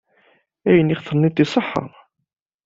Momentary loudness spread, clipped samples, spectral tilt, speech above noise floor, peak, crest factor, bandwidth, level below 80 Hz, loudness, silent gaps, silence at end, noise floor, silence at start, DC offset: 11 LU; under 0.1%; -7.5 dB/octave; 42 dB; -2 dBFS; 18 dB; 7.8 kHz; -54 dBFS; -19 LUFS; none; 0.8 s; -59 dBFS; 0.65 s; under 0.1%